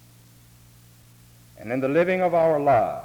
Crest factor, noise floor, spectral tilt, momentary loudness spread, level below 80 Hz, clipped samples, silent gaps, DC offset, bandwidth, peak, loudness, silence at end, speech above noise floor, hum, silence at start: 16 dB; -52 dBFS; -7.5 dB/octave; 10 LU; -58 dBFS; under 0.1%; none; under 0.1%; over 20 kHz; -10 dBFS; -21 LUFS; 0 s; 31 dB; none; 1.6 s